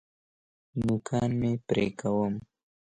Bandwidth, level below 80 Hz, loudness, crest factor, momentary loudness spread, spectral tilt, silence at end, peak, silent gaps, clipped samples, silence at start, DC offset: 10.5 kHz; -56 dBFS; -30 LUFS; 18 dB; 5 LU; -7 dB/octave; 0.55 s; -14 dBFS; none; under 0.1%; 0.75 s; under 0.1%